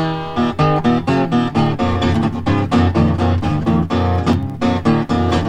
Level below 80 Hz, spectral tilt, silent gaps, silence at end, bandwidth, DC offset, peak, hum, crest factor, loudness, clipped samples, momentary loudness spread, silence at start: -34 dBFS; -7.5 dB/octave; none; 0 s; 9.4 kHz; under 0.1%; -2 dBFS; none; 14 dB; -16 LUFS; under 0.1%; 3 LU; 0 s